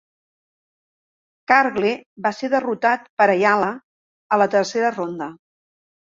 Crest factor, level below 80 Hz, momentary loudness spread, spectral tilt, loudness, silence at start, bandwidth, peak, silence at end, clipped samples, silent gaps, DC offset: 20 dB; -68 dBFS; 12 LU; -5 dB/octave; -19 LUFS; 1.5 s; 7.6 kHz; -2 dBFS; 0.8 s; under 0.1%; 2.06-2.16 s, 3.09-3.17 s, 3.84-4.30 s; under 0.1%